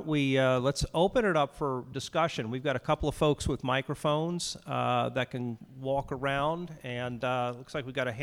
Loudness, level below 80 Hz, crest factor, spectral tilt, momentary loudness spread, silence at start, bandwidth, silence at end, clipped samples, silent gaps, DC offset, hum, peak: -30 LUFS; -48 dBFS; 18 dB; -5.5 dB/octave; 9 LU; 0 s; 15.5 kHz; 0 s; under 0.1%; none; under 0.1%; none; -12 dBFS